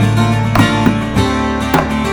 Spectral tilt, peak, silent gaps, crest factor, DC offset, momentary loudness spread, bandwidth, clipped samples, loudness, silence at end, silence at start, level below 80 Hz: -6 dB/octave; 0 dBFS; none; 12 dB; under 0.1%; 3 LU; over 20 kHz; under 0.1%; -13 LUFS; 0 s; 0 s; -28 dBFS